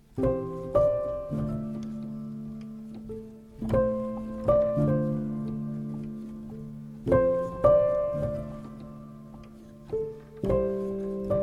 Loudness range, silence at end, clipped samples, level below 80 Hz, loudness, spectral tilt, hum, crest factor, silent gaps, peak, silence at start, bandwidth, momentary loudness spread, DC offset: 5 LU; 0 s; under 0.1%; -46 dBFS; -28 LUFS; -10 dB/octave; none; 20 dB; none; -10 dBFS; 0.1 s; 10 kHz; 18 LU; under 0.1%